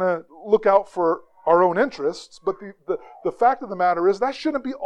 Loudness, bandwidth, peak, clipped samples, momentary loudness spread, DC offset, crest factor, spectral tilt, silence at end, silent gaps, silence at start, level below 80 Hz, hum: -22 LUFS; 9.8 kHz; -2 dBFS; under 0.1%; 12 LU; under 0.1%; 20 dB; -6 dB/octave; 0 s; none; 0 s; -60 dBFS; none